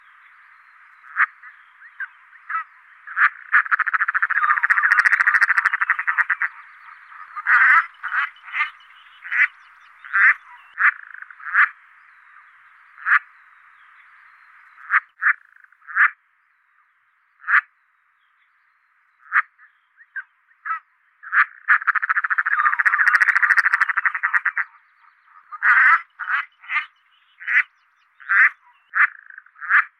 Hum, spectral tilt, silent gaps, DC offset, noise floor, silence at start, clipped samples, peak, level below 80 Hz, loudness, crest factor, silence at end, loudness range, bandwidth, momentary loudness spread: none; 2.5 dB/octave; none; under 0.1%; -63 dBFS; 1.1 s; under 0.1%; -2 dBFS; -82 dBFS; -18 LUFS; 20 dB; 0.1 s; 8 LU; 13 kHz; 18 LU